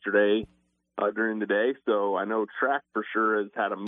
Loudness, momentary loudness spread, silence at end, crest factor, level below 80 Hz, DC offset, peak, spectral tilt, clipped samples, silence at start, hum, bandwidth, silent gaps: -27 LUFS; 5 LU; 0 s; 16 dB; -68 dBFS; under 0.1%; -10 dBFS; -8.5 dB/octave; under 0.1%; 0.05 s; none; 3.8 kHz; none